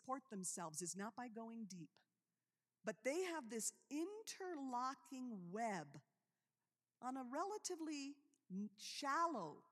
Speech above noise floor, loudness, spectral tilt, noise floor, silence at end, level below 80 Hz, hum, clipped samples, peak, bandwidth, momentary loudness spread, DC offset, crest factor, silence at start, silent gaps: over 42 dB; -48 LUFS; -3.5 dB/octave; under -90 dBFS; 0.1 s; under -90 dBFS; none; under 0.1%; -30 dBFS; 15 kHz; 10 LU; under 0.1%; 20 dB; 0.05 s; none